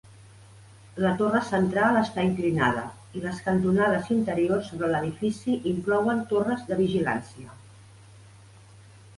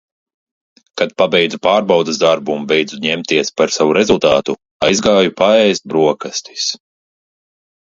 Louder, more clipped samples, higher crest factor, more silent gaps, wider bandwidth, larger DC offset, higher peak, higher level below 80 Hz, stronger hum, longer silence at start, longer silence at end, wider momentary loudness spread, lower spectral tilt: second, -25 LUFS vs -14 LUFS; neither; about the same, 18 dB vs 16 dB; second, none vs 4.71-4.80 s; first, 11.5 kHz vs 7.8 kHz; neither; second, -10 dBFS vs 0 dBFS; second, -56 dBFS vs -50 dBFS; neither; second, 0.55 s vs 0.95 s; second, 1 s vs 1.15 s; about the same, 10 LU vs 8 LU; first, -7 dB/octave vs -3.5 dB/octave